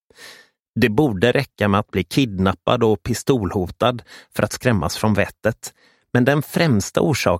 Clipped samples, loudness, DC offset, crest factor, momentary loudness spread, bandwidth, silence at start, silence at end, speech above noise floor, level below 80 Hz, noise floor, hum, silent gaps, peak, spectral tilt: under 0.1%; -19 LUFS; under 0.1%; 18 dB; 7 LU; 16.5 kHz; 0.2 s; 0 s; 28 dB; -44 dBFS; -47 dBFS; none; 0.68-0.74 s; 0 dBFS; -5.5 dB/octave